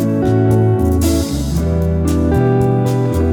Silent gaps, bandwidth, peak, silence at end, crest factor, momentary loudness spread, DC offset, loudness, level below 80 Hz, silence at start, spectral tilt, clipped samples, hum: none; 18.5 kHz; -2 dBFS; 0 s; 12 dB; 4 LU; under 0.1%; -15 LUFS; -26 dBFS; 0 s; -7.5 dB/octave; under 0.1%; none